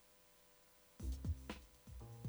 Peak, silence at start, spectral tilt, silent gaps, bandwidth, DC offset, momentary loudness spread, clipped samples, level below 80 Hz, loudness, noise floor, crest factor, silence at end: -32 dBFS; 0 s; -6 dB/octave; none; over 20 kHz; under 0.1%; 20 LU; under 0.1%; -52 dBFS; -50 LUFS; -69 dBFS; 18 dB; 0 s